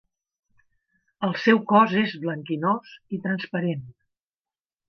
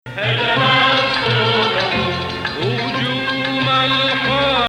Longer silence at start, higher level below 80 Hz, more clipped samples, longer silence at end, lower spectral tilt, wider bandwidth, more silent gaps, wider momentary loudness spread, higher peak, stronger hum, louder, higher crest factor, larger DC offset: first, 1.2 s vs 0.05 s; second, -72 dBFS vs -46 dBFS; neither; first, 0.95 s vs 0 s; first, -7.5 dB/octave vs -5 dB/octave; second, 6.4 kHz vs 12.5 kHz; neither; first, 13 LU vs 7 LU; about the same, -4 dBFS vs -4 dBFS; neither; second, -23 LUFS vs -16 LUFS; first, 22 dB vs 14 dB; neither